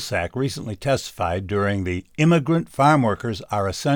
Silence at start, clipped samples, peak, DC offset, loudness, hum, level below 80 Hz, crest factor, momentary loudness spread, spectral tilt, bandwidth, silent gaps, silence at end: 0 s; under 0.1%; -4 dBFS; under 0.1%; -22 LUFS; none; -48 dBFS; 16 dB; 9 LU; -6 dB/octave; 18 kHz; none; 0 s